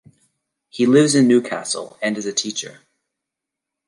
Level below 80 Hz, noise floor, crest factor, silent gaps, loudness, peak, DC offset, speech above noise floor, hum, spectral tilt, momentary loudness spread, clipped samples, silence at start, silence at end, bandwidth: -70 dBFS; -84 dBFS; 18 dB; none; -18 LUFS; -2 dBFS; under 0.1%; 66 dB; none; -4 dB/octave; 14 LU; under 0.1%; 0.75 s; 1.15 s; 11.5 kHz